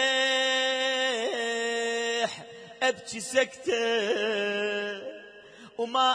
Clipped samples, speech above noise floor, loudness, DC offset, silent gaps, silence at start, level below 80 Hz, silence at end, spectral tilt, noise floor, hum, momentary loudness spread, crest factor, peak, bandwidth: under 0.1%; 22 dB; -27 LUFS; under 0.1%; none; 0 s; -76 dBFS; 0 s; -1.5 dB/octave; -50 dBFS; none; 13 LU; 18 dB; -12 dBFS; 10.5 kHz